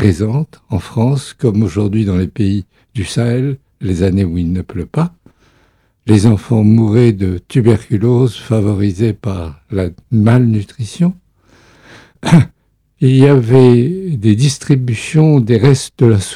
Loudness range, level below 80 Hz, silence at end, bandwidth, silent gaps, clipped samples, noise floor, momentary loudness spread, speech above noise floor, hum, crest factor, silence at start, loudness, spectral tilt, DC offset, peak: 6 LU; -40 dBFS; 0 s; 12 kHz; none; 0.4%; -54 dBFS; 11 LU; 43 dB; none; 12 dB; 0 s; -13 LUFS; -7.5 dB/octave; under 0.1%; 0 dBFS